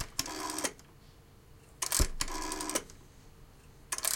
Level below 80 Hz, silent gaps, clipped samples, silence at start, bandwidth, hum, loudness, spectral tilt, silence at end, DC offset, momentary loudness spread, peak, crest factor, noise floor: -44 dBFS; none; under 0.1%; 0 s; 17 kHz; none; -34 LUFS; -2 dB/octave; 0 s; under 0.1%; 17 LU; -12 dBFS; 26 dB; -57 dBFS